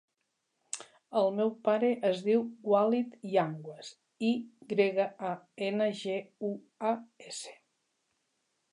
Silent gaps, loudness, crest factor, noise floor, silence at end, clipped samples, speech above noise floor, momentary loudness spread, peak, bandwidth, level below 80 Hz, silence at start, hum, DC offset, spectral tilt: none; -31 LUFS; 18 dB; -81 dBFS; 1.2 s; under 0.1%; 51 dB; 14 LU; -14 dBFS; 11 kHz; -88 dBFS; 0.75 s; none; under 0.1%; -5 dB/octave